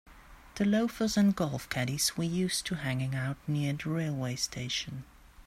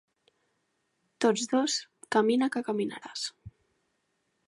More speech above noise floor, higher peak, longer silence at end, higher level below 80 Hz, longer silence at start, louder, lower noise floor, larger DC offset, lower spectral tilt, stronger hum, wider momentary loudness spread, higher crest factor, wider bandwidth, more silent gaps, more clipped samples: second, 20 dB vs 49 dB; second, -16 dBFS vs -12 dBFS; second, 0.05 s vs 1 s; first, -56 dBFS vs -70 dBFS; second, 0.05 s vs 1.2 s; about the same, -31 LUFS vs -29 LUFS; second, -51 dBFS vs -77 dBFS; neither; about the same, -4.5 dB/octave vs -3.5 dB/octave; neither; second, 7 LU vs 10 LU; second, 14 dB vs 20 dB; first, 16 kHz vs 11.5 kHz; neither; neither